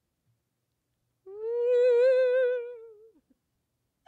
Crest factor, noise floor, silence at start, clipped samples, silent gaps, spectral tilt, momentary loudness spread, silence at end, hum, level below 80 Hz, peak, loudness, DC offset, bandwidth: 12 dB; -80 dBFS; 1.25 s; under 0.1%; none; -2.5 dB/octave; 15 LU; 1.2 s; none; -88 dBFS; -16 dBFS; -25 LUFS; under 0.1%; 4.5 kHz